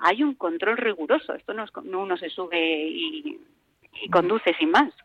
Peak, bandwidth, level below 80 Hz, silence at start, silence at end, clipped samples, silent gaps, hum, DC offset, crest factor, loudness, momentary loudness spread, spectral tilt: -6 dBFS; 8.6 kHz; -68 dBFS; 0 s; 0.15 s; under 0.1%; none; none; under 0.1%; 18 dB; -24 LUFS; 14 LU; -5.5 dB/octave